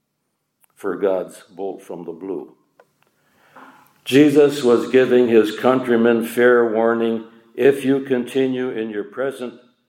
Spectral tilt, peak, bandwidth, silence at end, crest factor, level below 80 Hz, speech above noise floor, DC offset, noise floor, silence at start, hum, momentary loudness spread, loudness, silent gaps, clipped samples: -6 dB/octave; -2 dBFS; 16.5 kHz; 0.35 s; 18 dB; -72 dBFS; 56 dB; under 0.1%; -73 dBFS; 0.85 s; none; 17 LU; -17 LUFS; none; under 0.1%